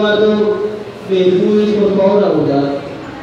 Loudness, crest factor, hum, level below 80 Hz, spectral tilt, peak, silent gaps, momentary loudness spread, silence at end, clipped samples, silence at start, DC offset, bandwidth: -13 LUFS; 12 dB; none; -50 dBFS; -7.5 dB/octave; -2 dBFS; none; 11 LU; 0 s; under 0.1%; 0 s; under 0.1%; 7.6 kHz